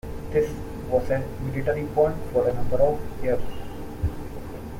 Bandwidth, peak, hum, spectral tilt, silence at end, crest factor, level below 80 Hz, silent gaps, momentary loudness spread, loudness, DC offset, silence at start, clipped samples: 16.5 kHz; -8 dBFS; none; -8 dB/octave; 0 s; 16 dB; -38 dBFS; none; 14 LU; -26 LUFS; under 0.1%; 0.05 s; under 0.1%